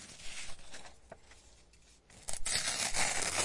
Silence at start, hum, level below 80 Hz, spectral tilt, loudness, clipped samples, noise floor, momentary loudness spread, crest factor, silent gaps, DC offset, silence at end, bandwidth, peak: 0 s; none; -54 dBFS; 0 dB/octave; -34 LUFS; under 0.1%; -62 dBFS; 24 LU; 22 dB; none; under 0.1%; 0 s; 11.5 kHz; -16 dBFS